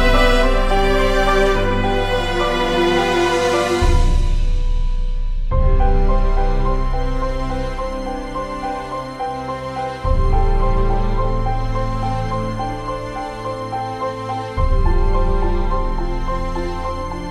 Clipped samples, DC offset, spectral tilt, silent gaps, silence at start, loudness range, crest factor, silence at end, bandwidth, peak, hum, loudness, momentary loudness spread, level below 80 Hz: under 0.1%; under 0.1%; -6 dB/octave; none; 0 s; 7 LU; 14 dB; 0 s; 10.5 kHz; -2 dBFS; none; -20 LUFS; 9 LU; -18 dBFS